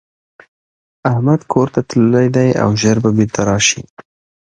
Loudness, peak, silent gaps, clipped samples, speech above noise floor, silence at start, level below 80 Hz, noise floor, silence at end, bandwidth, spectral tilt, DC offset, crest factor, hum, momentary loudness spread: -14 LUFS; 0 dBFS; 3.90-3.97 s; under 0.1%; over 77 dB; 1.05 s; -44 dBFS; under -90 dBFS; 0.4 s; 9.8 kHz; -5 dB/octave; under 0.1%; 14 dB; none; 4 LU